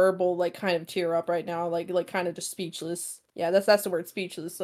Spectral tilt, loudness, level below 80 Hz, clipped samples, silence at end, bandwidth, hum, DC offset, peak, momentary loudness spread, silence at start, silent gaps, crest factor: -4 dB/octave; -28 LUFS; -80 dBFS; under 0.1%; 0 s; 16 kHz; none; under 0.1%; -8 dBFS; 11 LU; 0 s; none; 20 dB